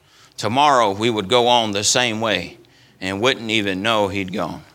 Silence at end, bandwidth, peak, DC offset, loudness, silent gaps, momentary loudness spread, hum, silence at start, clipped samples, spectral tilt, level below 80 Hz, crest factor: 0.15 s; 18 kHz; 0 dBFS; under 0.1%; -18 LUFS; none; 12 LU; none; 0.4 s; under 0.1%; -3 dB/octave; -60 dBFS; 18 dB